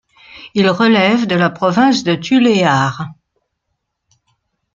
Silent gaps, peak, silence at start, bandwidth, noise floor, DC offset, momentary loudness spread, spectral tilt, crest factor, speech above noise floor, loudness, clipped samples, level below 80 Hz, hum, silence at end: none; 0 dBFS; 0.35 s; 7.6 kHz; -73 dBFS; under 0.1%; 9 LU; -5.5 dB/octave; 16 dB; 60 dB; -13 LUFS; under 0.1%; -56 dBFS; none; 1.6 s